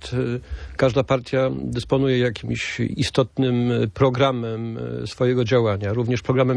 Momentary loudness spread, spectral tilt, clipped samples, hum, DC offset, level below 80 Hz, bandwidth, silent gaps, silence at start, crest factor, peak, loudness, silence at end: 9 LU; -6.5 dB/octave; under 0.1%; none; under 0.1%; -44 dBFS; 10.5 kHz; none; 0 s; 18 dB; -4 dBFS; -22 LUFS; 0 s